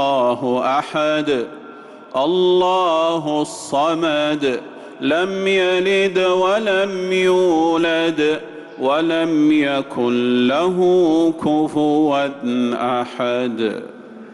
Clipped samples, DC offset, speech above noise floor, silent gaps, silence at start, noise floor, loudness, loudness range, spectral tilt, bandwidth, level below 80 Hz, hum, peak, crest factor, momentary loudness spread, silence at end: under 0.1%; under 0.1%; 21 dB; none; 0 s; -38 dBFS; -18 LUFS; 2 LU; -5 dB/octave; 11.5 kHz; -60 dBFS; none; -8 dBFS; 10 dB; 8 LU; 0 s